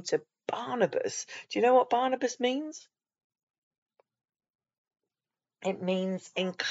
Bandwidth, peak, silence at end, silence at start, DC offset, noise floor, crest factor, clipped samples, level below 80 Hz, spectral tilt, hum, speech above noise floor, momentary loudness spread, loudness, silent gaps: 8 kHz; -12 dBFS; 0 s; 0 s; under 0.1%; under -90 dBFS; 20 dB; under 0.1%; under -90 dBFS; -3.5 dB/octave; none; over 61 dB; 13 LU; -30 LUFS; 3.24-3.30 s, 3.43-3.47 s, 3.58-3.71 s, 3.78-3.86 s, 4.55-4.59 s, 4.78-4.85 s